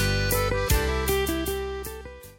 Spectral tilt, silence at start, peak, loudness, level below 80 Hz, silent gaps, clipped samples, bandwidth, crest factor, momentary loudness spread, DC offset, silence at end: -4 dB/octave; 0 s; -10 dBFS; -26 LUFS; -32 dBFS; none; under 0.1%; 17 kHz; 16 dB; 11 LU; under 0.1%; 0.05 s